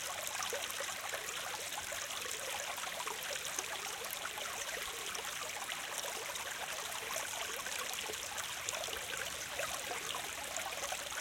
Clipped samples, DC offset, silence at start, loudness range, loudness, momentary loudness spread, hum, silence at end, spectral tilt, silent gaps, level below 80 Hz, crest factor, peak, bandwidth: under 0.1%; under 0.1%; 0 s; 1 LU; -39 LUFS; 2 LU; none; 0 s; 0.5 dB/octave; none; -70 dBFS; 26 dB; -16 dBFS; 17 kHz